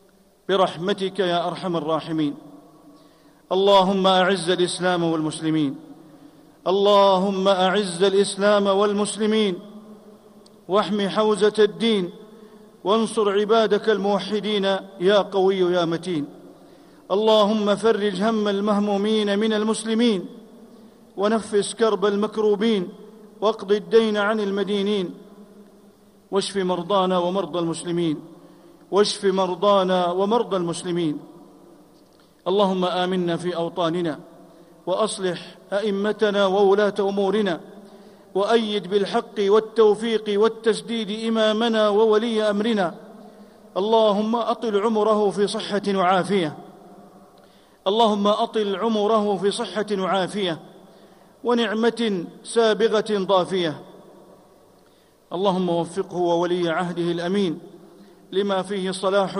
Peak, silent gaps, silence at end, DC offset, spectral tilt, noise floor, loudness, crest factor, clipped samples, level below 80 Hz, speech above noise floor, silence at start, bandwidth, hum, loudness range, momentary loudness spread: -6 dBFS; none; 0 s; under 0.1%; -5 dB/octave; -55 dBFS; -21 LUFS; 16 dB; under 0.1%; -68 dBFS; 35 dB; 0.5 s; 11.5 kHz; none; 4 LU; 9 LU